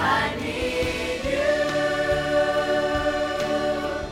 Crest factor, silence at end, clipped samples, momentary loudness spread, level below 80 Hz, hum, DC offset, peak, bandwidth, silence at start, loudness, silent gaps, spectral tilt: 14 dB; 0 s; under 0.1%; 4 LU; -40 dBFS; none; under 0.1%; -10 dBFS; 16 kHz; 0 s; -24 LUFS; none; -4.5 dB/octave